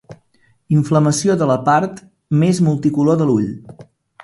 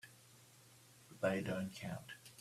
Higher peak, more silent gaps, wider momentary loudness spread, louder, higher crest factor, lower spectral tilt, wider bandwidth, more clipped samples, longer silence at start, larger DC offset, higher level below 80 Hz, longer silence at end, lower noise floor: first, -2 dBFS vs -22 dBFS; neither; second, 6 LU vs 23 LU; first, -16 LUFS vs -42 LUFS; second, 14 dB vs 22 dB; about the same, -6.5 dB/octave vs -5.5 dB/octave; second, 11.5 kHz vs 15 kHz; neither; about the same, 0.1 s vs 0.05 s; neither; first, -54 dBFS vs -76 dBFS; first, 0.4 s vs 0 s; second, -57 dBFS vs -64 dBFS